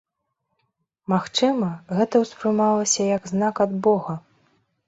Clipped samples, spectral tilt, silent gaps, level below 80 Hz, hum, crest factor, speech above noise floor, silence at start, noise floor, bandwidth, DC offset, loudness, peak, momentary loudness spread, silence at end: under 0.1%; -4.5 dB/octave; none; -64 dBFS; none; 16 dB; 56 dB; 1.1 s; -77 dBFS; 8.2 kHz; under 0.1%; -22 LUFS; -6 dBFS; 6 LU; 0.7 s